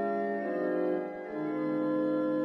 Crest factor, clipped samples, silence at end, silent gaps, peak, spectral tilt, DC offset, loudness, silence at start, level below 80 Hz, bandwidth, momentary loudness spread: 12 dB; under 0.1%; 0 s; none; -20 dBFS; -9 dB/octave; under 0.1%; -32 LUFS; 0 s; -78 dBFS; 5.4 kHz; 5 LU